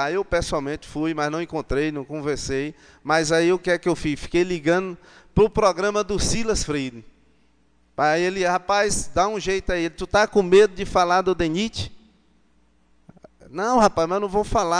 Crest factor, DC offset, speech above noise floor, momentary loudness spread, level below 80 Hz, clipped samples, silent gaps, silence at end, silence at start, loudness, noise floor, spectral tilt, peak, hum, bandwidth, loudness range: 20 dB; under 0.1%; 41 dB; 10 LU; -40 dBFS; under 0.1%; none; 0 s; 0 s; -22 LUFS; -62 dBFS; -4.5 dB/octave; -2 dBFS; none; 10 kHz; 4 LU